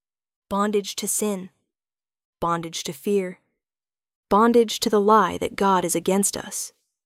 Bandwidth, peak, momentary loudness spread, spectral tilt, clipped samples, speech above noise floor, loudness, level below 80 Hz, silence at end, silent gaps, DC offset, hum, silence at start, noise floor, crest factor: 16.5 kHz; -6 dBFS; 13 LU; -4 dB/octave; under 0.1%; over 68 dB; -22 LUFS; -56 dBFS; 0.35 s; 2.25-2.33 s, 4.15-4.23 s; under 0.1%; none; 0.5 s; under -90 dBFS; 18 dB